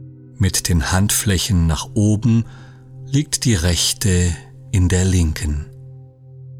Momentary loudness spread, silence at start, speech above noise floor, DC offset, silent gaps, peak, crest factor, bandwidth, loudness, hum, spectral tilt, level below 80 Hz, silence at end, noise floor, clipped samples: 9 LU; 0 s; 23 dB; under 0.1%; none; -4 dBFS; 14 dB; 17 kHz; -18 LUFS; none; -4.5 dB/octave; -30 dBFS; 0 s; -40 dBFS; under 0.1%